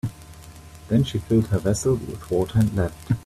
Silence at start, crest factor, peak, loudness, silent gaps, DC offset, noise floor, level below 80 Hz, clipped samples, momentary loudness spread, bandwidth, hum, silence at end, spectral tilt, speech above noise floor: 0.05 s; 16 dB; -8 dBFS; -23 LUFS; none; under 0.1%; -43 dBFS; -44 dBFS; under 0.1%; 22 LU; 14.5 kHz; none; 0 s; -7 dB/octave; 21 dB